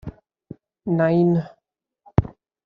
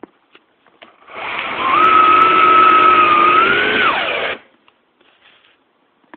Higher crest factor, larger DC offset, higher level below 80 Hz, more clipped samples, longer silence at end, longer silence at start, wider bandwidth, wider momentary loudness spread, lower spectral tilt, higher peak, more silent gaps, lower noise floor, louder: first, 24 dB vs 14 dB; neither; first, -44 dBFS vs -52 dBFS; neither; second, 0.35 s vs 1.8 s; second, 0.05 s vs 1.1 s; first, 5.2 kHz vs 4.5 kHz; first, 22 LU vs 15 LU; first, -9 dB/octave vs -5.5 dB/octave; about the same, 0 dBFS vs 0 dBFS; neither; first, -76 dBFS vs -59 dBFS; second, -21 LUFS vs -11 LUFS